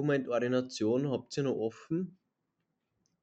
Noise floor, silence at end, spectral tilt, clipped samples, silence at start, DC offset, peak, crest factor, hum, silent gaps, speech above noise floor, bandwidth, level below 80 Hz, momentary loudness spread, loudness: -83 dBFS; 1.1 s; -6.5 dB/octave; under 0.1%; 0 s; under 0.1%; -18 dBFS; 16 dB; none; none; 51 dB; 8.8 kHz; -76 dBFS; 6 LU; -33 LUFS